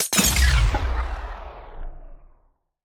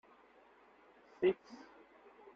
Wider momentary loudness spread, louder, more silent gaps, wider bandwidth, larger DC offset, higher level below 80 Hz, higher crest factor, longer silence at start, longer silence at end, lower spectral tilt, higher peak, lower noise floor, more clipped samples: about the same, 24 LU vs 26 LU; first, -21 LUFS vs -37 LUFS; neither; first, over 20 kHz vs 6.4 kHz; neither; first, -26 dBFS vs -80 dBFS; about the same, 20 dB vs 22 dB; second, 0 s vs 1.2 s; about the same, 0.7 s vs 0.8 s; second, -3 dB/octave vs -5 dB/octave; first, -4 dBFS vs -20 dBFS; about the same, -62 dBFS vs -65 dBFS; neither